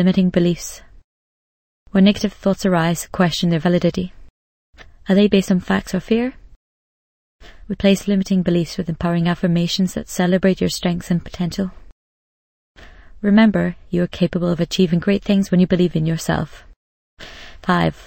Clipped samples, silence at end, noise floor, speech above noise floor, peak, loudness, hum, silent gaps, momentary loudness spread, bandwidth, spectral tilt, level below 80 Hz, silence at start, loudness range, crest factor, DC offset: under 0.1%; 0 s; under -90 dBFS; over 73 dB; 0 dBFS; -18 LUFS; none; 1.04-1.86 s, 4.30-4.73 s, 6.56-7.39 s, 11.92-12.75 s, 16.76-17.17 s; 11 LU; 16.5 kHz; -6.5 dB/octave; -42 dBFS; 0 s; 3 LU; 18 dB; under 0.1%